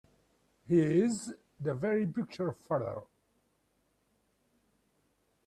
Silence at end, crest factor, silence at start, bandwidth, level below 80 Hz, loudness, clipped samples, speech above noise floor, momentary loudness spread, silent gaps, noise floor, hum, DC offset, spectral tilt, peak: 2.4 s; 20 dB; 0.7 s; 12 kHz; -72 dBFS; -32 LUFS; under 0.1%; 44 dB; 12 LU; none; -75 dBFS; none; under 0.1%; -7 dB/octave; -16 dBFS